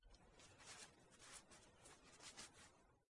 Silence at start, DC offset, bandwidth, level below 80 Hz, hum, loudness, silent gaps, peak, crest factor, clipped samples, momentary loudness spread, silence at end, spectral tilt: 0 s; under 0.1%; 12 kHz; -78 dBFS; none; -62 LUFS; none; -44 dBFS; 22 dB; under 0.1%; 9 LU; 0 s; -1.5 dB/octave